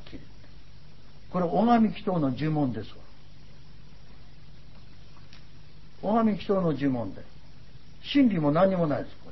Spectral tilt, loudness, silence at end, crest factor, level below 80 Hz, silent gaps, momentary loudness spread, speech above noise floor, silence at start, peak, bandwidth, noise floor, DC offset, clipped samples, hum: -9 dB/octave; -26 LUFS; 0 s; 18 dB; -54 dBFS; none; 17 LU; 26 dB; 0 s; -10 dBFS; 6 kHz; -52 dBFS; 1%; under 0.1%; 50 Hz at -55 dBFS